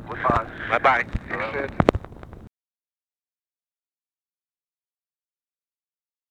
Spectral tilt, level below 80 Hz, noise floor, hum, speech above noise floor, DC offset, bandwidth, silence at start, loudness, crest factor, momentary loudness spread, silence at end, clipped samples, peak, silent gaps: -7 dB/octave; -42 dBFS; under -90 dBFS; none; over 68 dB; under 0.1%; 14 kHz; 0 s; -23 LUFS; 28 dB; 15 LU; 3.8 s; under 0.1%; 0 dBFS; none